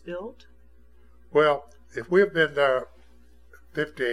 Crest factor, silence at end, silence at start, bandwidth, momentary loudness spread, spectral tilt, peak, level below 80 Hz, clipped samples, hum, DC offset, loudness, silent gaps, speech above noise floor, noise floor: 20 dB; 0 s; 0.05 s; 12 kHz; 17 LU; -6 dB/octave; -6 dBFS; -56 dBFS; under 0.1%; 60 Hz at -55 dBFS; 0.3%; -24 LUFS; none; 32 dB; -56 dBFS